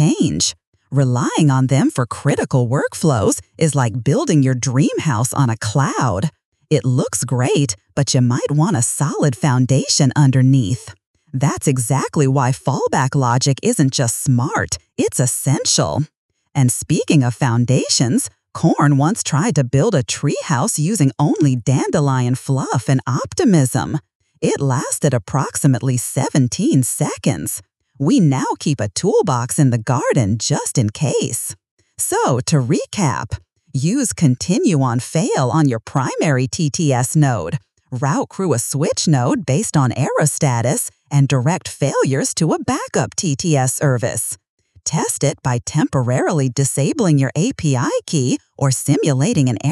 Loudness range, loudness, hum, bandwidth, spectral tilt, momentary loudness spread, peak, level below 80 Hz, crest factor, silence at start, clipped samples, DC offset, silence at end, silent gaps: 2 LU; -17 LUFS; none; 13.5 kHz; -5.5 dB/octave; 6 LU; -2 dBFS; -50 dBFS; 14 dB; 0 s; under 0.1%; under 0.1%; 0 s; 0.67-0.72 s, 6.45-6.52 s, 11.06-11.14 s, 16.15-16.29 s, 24.15-24.20 s, 31.71-31.77 s, 44.49-44.58 s